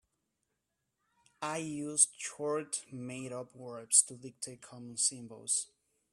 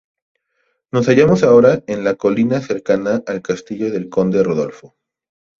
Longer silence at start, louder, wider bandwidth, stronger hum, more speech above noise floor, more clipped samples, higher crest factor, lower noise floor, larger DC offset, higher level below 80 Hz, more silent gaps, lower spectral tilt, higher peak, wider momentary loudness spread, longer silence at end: first, 1.4 s vs 0.95 s; second, -31 LUFS vs -16 LUFS; first, 15 kHz vs 7.4 kHz; neither; about the same, 49 dB vs 52 dB; neither; first, 26 dB vs 16 dB; first, -84 dBFS vs -67 dBFS; neither; second, -82 dBFS vs -52 dBFS; neither; second, -2 dB/octave vs -7 dB/octave; second, -10 dBFS vs 0 dBFS; first, 18 LU vs 12 LU; second, 0.45 s vs 0.85 s